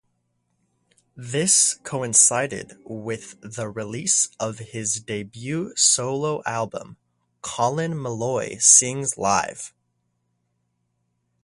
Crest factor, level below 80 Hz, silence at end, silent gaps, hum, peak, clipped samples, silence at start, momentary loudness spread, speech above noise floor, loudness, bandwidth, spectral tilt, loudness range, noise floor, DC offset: 24 dB; -62 dBFS; 1.75 s; none; none; 0 dBFS; under 0.1%; 1.15 s; 19 LU; 50 dB; -20 LUFS; 11.5 kHz; -2 dB/octave; 4 LU; -73 dBFS; under 0.1%